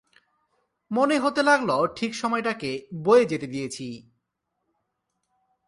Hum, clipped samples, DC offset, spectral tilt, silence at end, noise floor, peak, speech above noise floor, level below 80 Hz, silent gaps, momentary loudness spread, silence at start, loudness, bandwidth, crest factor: none; under 0.1%; under 0.1%; -4.5 dB/octave; 1.65 s; -80 dBFS; -6 dBFS; 56 dB; -68 dBFS; none; 13 LU; 0.9 s; -24 LUFS; 11.5 kHz; 20 dB